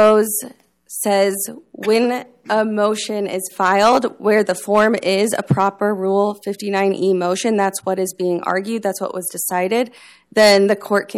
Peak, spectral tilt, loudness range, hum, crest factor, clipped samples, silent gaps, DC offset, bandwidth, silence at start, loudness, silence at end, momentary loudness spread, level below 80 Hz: -2 dBFS; -4 dB/octave; 3 LU; none; 14 dB; under 0.1%; none; under 0.1%; 16 kHz; 0 s; -18 LUFS; 0 s; 10 LU; -60 dBFS